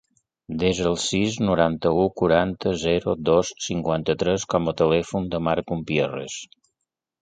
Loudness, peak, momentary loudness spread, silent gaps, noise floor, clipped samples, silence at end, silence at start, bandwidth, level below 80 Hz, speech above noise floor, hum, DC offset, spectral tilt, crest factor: -23 LUFS; -4 dBFS; 6 LU; none; -82 dBFS; under 0.1%; 0.75 s; 0.5 s; 9.4 kHz; -46 dBFS; 60 dB; none; under 0.1%; -5 dB/octave; 20 dB